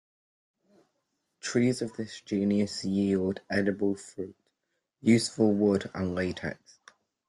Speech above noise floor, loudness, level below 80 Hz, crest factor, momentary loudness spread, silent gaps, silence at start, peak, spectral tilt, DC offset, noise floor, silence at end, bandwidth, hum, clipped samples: 54 dB; -29 LUFS; -66 dBFS; 20 dB; 14 LU; none; 1.45 s; -10 dBFS; -6 dB/octave; under 0.1%; -82 dBFS; 0.75 s; 12 kHz; none; under 0.1%